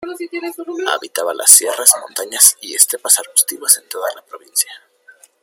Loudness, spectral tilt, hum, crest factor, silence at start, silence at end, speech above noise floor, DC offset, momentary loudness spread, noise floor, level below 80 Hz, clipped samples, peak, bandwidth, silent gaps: -12 LUFS; 2 dB/octave; none; 16 dB; 0 s; 0.65 s; 32 dB; under 0.1%; 17 LU; -48 dBFS; -68 dBFS; 0.4%; 0 dBFS; over 20 kHz; none